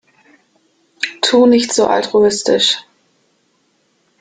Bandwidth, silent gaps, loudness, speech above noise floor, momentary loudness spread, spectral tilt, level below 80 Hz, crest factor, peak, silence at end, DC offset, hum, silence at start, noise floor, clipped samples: 9.6 kHz; none; -13 LUFS; 49 dB; 11 LU; -2.5 dB/octave; -58 dBFS; 16 dB; 0 dBFS; 1.4 s; under 0.1%; none; 1 s; -61 dBFS; under 0.1%